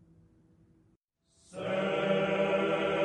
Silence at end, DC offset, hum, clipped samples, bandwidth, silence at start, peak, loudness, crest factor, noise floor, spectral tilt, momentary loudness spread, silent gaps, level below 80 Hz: 0 s; under 0.1%; none; under 0.1%; 10 kHz; 1.5 s; -16 dBFS; -30 LUFS; 16 dB; -71 dBFS; -6 dB/octave; 10 LU; none; -68 dBFS